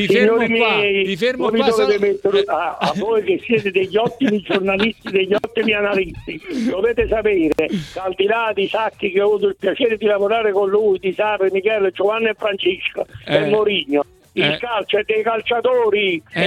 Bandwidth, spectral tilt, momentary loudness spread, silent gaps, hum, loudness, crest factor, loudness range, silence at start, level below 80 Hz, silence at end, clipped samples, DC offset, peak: 12.5 kHz; -5.5 dB/octave; 5 LU; none; none; -18 LUFS; 16 dB; 2 LU; 0 s; -46 dBFS; 0 s; under 0.1%; under 0.1%; -2 dBFS